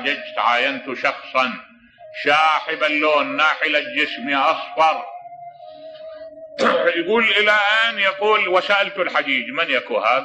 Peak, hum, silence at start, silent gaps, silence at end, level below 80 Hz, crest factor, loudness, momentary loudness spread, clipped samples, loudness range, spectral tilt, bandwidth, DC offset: -4 dBFS; none; 0 s; none; 0 s; -68 dBFS; 16 dB; -18 LUFS; 21 LU; under 0.1%; 4 LU; -3 dB/octave; 9.2 kHz; under 0.1%